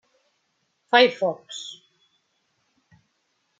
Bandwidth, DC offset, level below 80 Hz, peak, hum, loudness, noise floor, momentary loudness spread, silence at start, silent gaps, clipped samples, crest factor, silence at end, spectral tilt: 7.8 kHz; under 0.1%; -82 dBFS; -2 dBFS; none; -21 LUFS; -72 dBFS; 18 LU; 0.95 s; none; under 0.1%; 26 dB; 1.85 s; -3 dB/octave